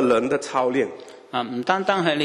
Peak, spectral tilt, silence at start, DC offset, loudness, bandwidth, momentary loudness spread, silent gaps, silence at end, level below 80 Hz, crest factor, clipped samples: -2 dBFS; -5 dB/octave; 0 s; under 0.1%; -23 LUFS; 11.5 kHz; 9 LU; none; 0 s; -64 dBFS; 20 dB; under 0.1%